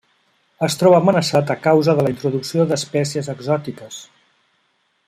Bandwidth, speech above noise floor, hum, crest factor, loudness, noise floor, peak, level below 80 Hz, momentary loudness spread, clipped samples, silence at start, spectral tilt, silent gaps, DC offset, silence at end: 16 kHz; 48 dB; none; 16 dB; -18 LUFS; -65 dBFS; -2 dBFS; -60 dBFS; 14 LU; under 0.1%; 0.6 s; -5.5 dB/octave; none; under 0.1%; 1.05 s